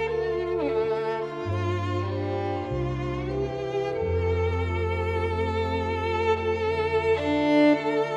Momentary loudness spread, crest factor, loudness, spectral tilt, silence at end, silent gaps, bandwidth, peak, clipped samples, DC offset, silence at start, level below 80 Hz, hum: 7 LU; 14 dB; -26 LUFS; -7.5 dB/octave; 0 s; none; 8.6 kHz; -10 dBFS; under 0.1%; under 0.1%; 0 s; -42 dBFS; none